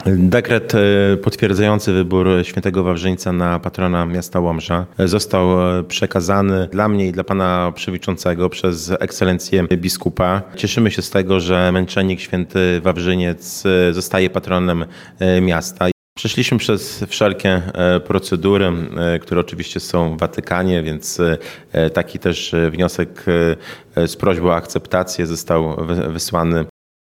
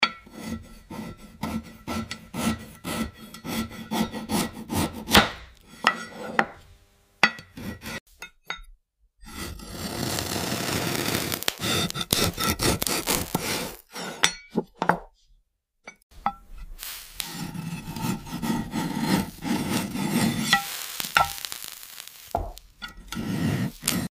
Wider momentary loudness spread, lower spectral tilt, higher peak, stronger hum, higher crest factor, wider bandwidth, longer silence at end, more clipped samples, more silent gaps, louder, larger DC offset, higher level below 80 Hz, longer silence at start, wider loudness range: second, 6 LU vs 16 LU; first, -5.5 dB/octave vs -3.5 dB/octave; about the same, 0 dBFS vs -2 dBFS; neither; second, 16 dB vs 28 dB; about the same, 16 kHz vs 16 kHz; first, 0.35 s vs 0.1 s; neither; first, 15.92-16.16 s vs 8.00-8.06 s, 16.02-16.10 s; first, -17 LUFS vs -27 LUFS; neither; about the same, -44 dBFS vs -46 dBFS; about the same, 0 s vs 0 s; second, 2 LU vs 8 LU